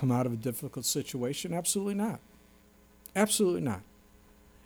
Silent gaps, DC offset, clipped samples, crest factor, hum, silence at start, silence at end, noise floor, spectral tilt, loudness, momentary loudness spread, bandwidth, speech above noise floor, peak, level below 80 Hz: none; under 0.1%; under 0.1%; 20 dB; none; 0 s; 0.8 s; -60 dBFS; -4.5 dB/octave; -31 LUFS; 9 LU; over 20 kHz; 29 dB; -12 dBFS; -64 dBFS